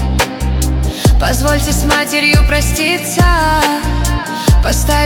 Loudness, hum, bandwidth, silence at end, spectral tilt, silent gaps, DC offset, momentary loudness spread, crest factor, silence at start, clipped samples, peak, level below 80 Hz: -13 LUFS; none; 18 kHz; 0 s; -4.5 dB/octave; none; under 0.1%; 5 LU; 12 dB; 0 s; under 0.1%; 0 dBFS; -16 dBFS